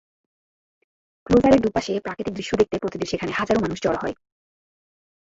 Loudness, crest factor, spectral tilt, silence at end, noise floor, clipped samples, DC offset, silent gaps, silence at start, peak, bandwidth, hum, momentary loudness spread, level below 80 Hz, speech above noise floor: -22 LUFS; 20 dB; -6 dB/octave; 1.2 s; under -90 dBFS; under 0.1%; under 0.1%; none; 1.3 s; -4 dBFS; 8 kHz; none; 12 LU; -46 dBFS; over 69 dB